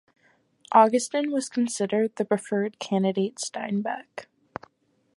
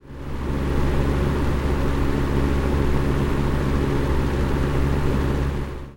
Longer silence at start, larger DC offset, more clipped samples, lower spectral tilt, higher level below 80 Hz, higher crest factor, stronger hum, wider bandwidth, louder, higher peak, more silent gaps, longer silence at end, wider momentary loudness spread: first, 0.7 s vs 0.05 s; neither; neither; second, -5 dB/octave vs -7.5 dB/octave; second, -74 dBFS vs -24 dBFS; first, 22 dB vs 14 dB; neither; second, 11.5 kHz vs 16.5 kHz; about the same, -25 LUFS vs -23 LUFS; about the same, -4 dBFS vs -6 dBFS; neither; first, 0.95 s vs 0 s; first, 23 LU vs 3 LU